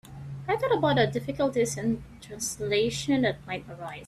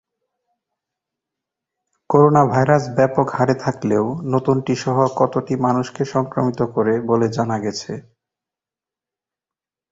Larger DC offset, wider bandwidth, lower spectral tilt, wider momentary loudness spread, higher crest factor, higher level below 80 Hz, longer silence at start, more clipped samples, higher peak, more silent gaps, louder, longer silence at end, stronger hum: neither; first, 14.5 kHz vs 7.8 kHz; second, -4.5 dB/octave vs -7 dB/octave; first, 13 LU vs 7 LU; about the same, 20 dB vs 18 dB; about the same, -54 dBFS vs -56 dBFS; second, 0.05 s vs 2.1 s; neither; second, -8 dBFS vs -2 dBFS; neither; second, -27 LUFS vs -18 LUFS; second, 0 s vs 1.9 s; neither